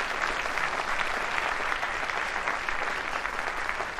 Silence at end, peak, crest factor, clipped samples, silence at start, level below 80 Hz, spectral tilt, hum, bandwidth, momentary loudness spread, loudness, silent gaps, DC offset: 0 s; -12 dBFS; 18 dB; under 0.1%; 0 s; -50 dBFS; -2 dB/octave; none; 15 kHz; 2 LU; -29 LUFS; none; under 0.1%